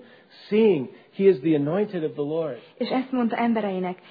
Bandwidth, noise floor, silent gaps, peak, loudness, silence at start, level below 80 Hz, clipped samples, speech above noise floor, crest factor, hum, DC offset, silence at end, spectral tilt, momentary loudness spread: 5 kHz; -49 dBFS; none; -6 dBFS; -24 LUFS; 0.4 s; -70 dBFS; under 0.1%; 26 dB; 16 dB; none; under 0.1%; 0.15 s; -10 dB/octave; 9 LU